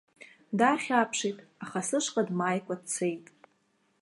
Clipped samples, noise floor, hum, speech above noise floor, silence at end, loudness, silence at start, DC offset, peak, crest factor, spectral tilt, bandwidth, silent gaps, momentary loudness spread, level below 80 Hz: under 0.1%; -72 dBFS; none; 42 dB; 0.8 s; -29 LUFS; 0.2 s; under 0.1%; -10 dBFS; 22 dB; -4 dB/octave; 11.5 kHz; none; 10 LU; -82 dBFS